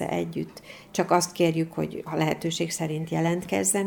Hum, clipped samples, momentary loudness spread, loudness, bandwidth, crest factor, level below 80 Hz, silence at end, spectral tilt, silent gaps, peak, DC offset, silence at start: none; under 0.1%; 9 LU; -27 LUFS; 19.5 kHz; 20 dB; -60 dBFS; 0 s; -4.5 dB/octave; none; -8 dBFS; under 0.1%; 0 s